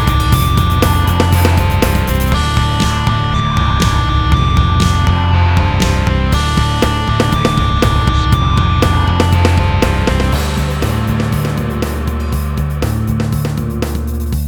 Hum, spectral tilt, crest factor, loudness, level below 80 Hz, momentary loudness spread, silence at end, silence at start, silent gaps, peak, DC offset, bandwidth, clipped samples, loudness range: none; -5.5 dB/octave; 12 dB; -14 LUFS; -18 dBFS; 6 LU; 0 s; 0 s; none; 0 dBFS; under 0.1%; 19.5 kHz; under 0.1%; 4 LU